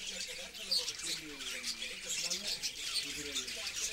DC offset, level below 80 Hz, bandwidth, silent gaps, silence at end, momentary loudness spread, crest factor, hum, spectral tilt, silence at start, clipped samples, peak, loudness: under 0.1%; -64 dBFS; 16 kHz; none; 0 s; 7 LU; 18 dB; none; 0.5 dB/octave; 0 s; under 0.1%; -20 dBFS; -36 LUFS